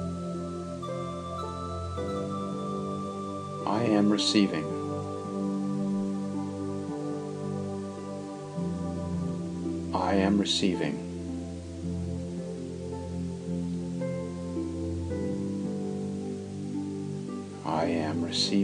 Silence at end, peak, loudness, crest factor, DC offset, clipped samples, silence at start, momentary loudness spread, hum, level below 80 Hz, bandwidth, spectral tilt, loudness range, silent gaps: 0 s; -10 dBFS; -31 LUFS; 20 dB; under 0.1%; under 0.1%; 0 s; 11 LU; none; -54 dBFS; 10.5 kHz; -5.5 dB/octave; 6 LU; none